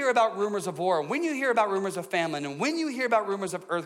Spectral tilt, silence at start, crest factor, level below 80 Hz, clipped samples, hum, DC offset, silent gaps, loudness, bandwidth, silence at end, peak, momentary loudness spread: -4.5 dB/octave; 0 s; 14 dB; -80 dBFS; under 0.1%; none; under 0.1%; none; -27 LUFS; 16 kHz; 0 s; -12 dBFS; 6 LU